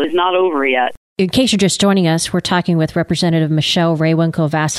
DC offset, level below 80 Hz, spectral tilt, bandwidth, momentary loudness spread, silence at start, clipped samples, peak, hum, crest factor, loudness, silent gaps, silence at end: under 0.1%; -48 dBFS; -5 dB/octave; 13.5 kHz; 4 LU; 0 s; under 0.1%; -2 dBFS; none; 14 dB; -15 LUFS; 0.97-1.16 s; 0 s